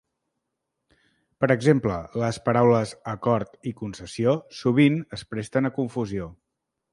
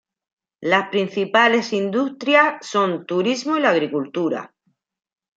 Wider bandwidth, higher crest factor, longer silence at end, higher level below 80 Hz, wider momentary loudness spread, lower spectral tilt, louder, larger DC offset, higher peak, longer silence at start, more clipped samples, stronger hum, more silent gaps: first, 11.5 kHz vs 7.8 kHz; about the same, 20 dB vs 20 dB; second, 0.6 s vs 0.9 s; first, -54 dBFS vs -72 dBFS; first, 14 LU vs 8 LU; first, -7 dB/octave vs -4.5 dB/octave; second, -24 LUFS vs -19 LUFS; neither; about the same, -4 dBFS vs -2 dBFS; first, 1.4 s vs 0.6 s; neither; neither; neither